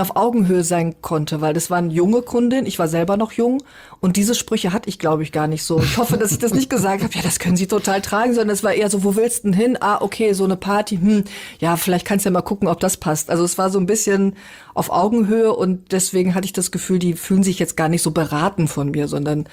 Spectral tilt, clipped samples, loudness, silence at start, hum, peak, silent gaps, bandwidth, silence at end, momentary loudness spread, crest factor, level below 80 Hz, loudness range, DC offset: -5 dB/octave; under 0.1%; -18 LUFS; 0 s; none; -6 dBFS; none; 19 kHz; 0.05 s; 4 LU; 12 dB; -48 dBFS; 1 LU; under 0.1%